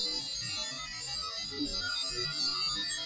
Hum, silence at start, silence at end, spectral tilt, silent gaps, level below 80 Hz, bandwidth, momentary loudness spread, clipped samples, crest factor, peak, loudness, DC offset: none; 0 s; 0 s; -1 dB/octave; none; -56 dBFS; 8 kHz; 6 LU; under 0.1%; 14 dB; -22 dBFS; -32 LUFS; under 0.1%